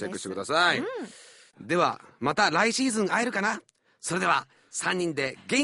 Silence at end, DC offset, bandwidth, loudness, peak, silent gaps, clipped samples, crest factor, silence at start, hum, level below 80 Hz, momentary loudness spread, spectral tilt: 0 s; under 0.1%; 11.5 kHz; -26 LUFS; -8 dBFS; none; under 0.1%; 20 dB; 0 s; none; -68 dBFS; 12 LU; -3 dB/octave